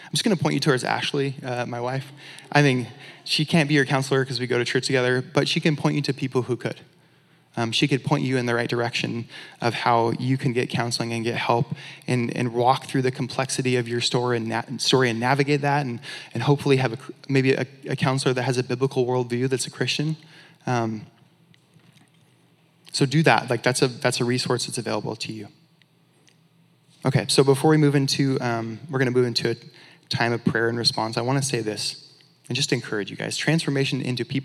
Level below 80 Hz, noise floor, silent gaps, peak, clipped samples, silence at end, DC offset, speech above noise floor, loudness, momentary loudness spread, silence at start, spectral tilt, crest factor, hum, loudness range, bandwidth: -72 dBFS; -60 dBFS; none; 0 dBFS; under 0.1%; 0 s; under 0.1%; 37 dB; -23 LUFS; 10 LU; 0 s; -5 dB/octave; 22 dB; none; 4 LU; 13.5 kHz